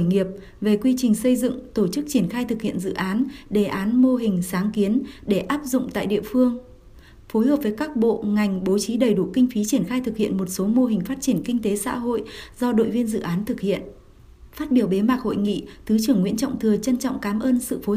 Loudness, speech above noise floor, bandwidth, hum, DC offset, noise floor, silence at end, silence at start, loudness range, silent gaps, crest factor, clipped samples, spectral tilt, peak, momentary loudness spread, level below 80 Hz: -22 LUFS; 25 dB; 15.5 kHz; none; under 0.1%; -47 dBFS; 0 s; 0 s; 2 LU; none; 14 dB; under 0.1%; -6 dB/octave; -6 dBFS; 6 LU; -48 dBFS